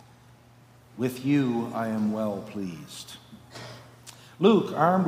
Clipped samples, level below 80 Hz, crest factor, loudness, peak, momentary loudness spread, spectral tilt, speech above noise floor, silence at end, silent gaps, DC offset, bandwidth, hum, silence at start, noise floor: under 0.1%; -68 dBFS; 22 dB; -26 LUFS; -6 dBFS; 24 LU; -7 dB/octave; 29 dB; 0 s; none; under 0.1%; 15.5 kHz; none; 0.95 s; -54 dBFS